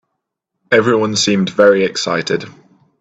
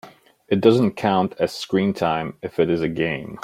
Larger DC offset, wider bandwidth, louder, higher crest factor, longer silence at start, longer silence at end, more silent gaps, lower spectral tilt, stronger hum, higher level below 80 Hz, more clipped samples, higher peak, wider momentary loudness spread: neither; second, 9 kHz vs 15.5 kHz; first, -14 LUFS vs -21 LUFS; about the same, 16 dB vs 20 dB; first, 0.7 s vs 0.05 s; first, 0.5 s vs 0 s; neither; second, -4 dB/octave vs -6.5 dB/octave; neither; about the same, -56 dBFS vs -56 dBFS; neither; about the same, 0 dBFS vs -2 dBFS; about the same, 10 LU vs 8 LU